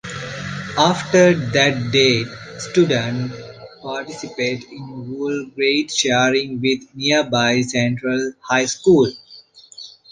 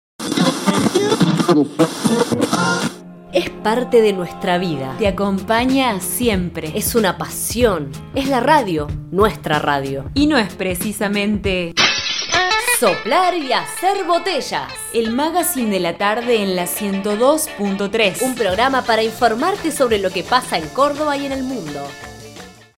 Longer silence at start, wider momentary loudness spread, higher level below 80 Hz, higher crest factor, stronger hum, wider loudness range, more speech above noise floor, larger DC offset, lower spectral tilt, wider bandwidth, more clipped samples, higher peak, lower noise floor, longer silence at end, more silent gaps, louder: second, 0.05 s vs 0.2 s; first, 16 LU vs 8 LU; second, -54 dBFS vs -40 dBFS; about the same, 18 dB vs 18 dB; neither; first, 6 LU vs 2 LU; first, 27 dB vs 21 dB; neither; about the same, -4 dB/octave vs -4 dB/octave; second, 10 kHz vs 17 kHz; neither; about the same, -2 dBFS vs 0 dBFS; first, -45 dBFS vs -39 dBFS; about the same, 0.2 s vs 0.25 s; neither; about the same, -18 LUFS vs -17 LUFS